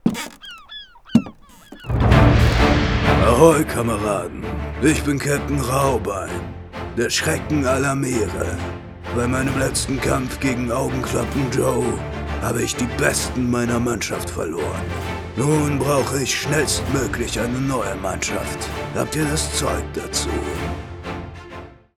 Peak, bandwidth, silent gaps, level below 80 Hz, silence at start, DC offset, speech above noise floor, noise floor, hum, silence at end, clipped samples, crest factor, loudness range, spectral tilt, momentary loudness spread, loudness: 0 dBFS; 16.5 kHz; none; -30 dBFS; 0.05 s; under 0.1%; 22 dB; -43 dBFS; none; 0.25 s; under 0.1%; 20 dB; 6 LU; -5 dB/octave; 14 LU; -20 LUFS